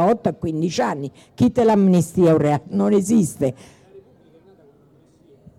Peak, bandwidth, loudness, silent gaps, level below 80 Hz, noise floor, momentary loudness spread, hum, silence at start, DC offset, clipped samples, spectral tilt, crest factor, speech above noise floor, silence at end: -6 dBFS; 13.5 kHz; -19 LUFS; none; -52 dBFS; -54 dBFS; 9 LU; none; 0 s; under 0.1%; under 0.1%; -7 dB/octave; 12 dB; 36 dB; 1.6 s